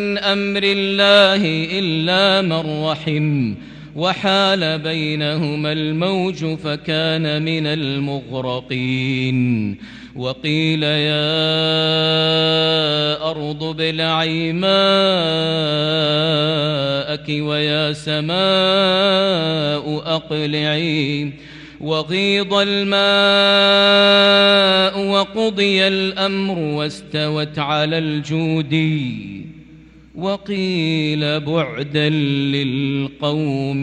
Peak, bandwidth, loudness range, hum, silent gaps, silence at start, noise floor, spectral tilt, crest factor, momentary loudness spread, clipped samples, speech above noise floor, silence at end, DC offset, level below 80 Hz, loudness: 0 dBFS; 10 kHz; 8 LU; none; none; 0 s; -43 dBFS; -5.5 dB/octave; 16 dB; 11 LU; under 0.1%; 26 dB; 0 s; under 0.1%; -52 dBFS; -17 LUFS